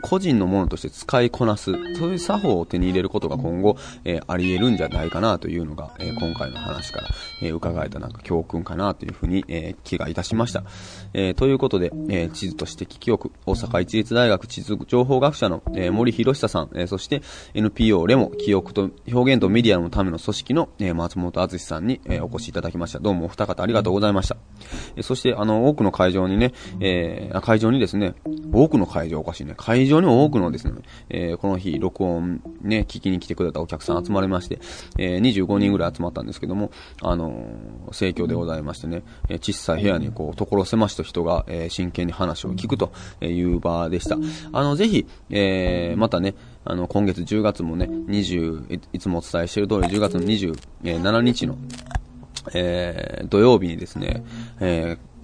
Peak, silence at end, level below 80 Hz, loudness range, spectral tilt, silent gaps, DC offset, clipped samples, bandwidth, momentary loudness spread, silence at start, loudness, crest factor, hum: -2 dBFS; 0 s; -38 dBFS; 6 LU; -6.5 dB/octave; none; under 0.1%; under 0.1%; 10.5 kHz; 12 LU; 0 s; -22 LUFS; 20 dB; none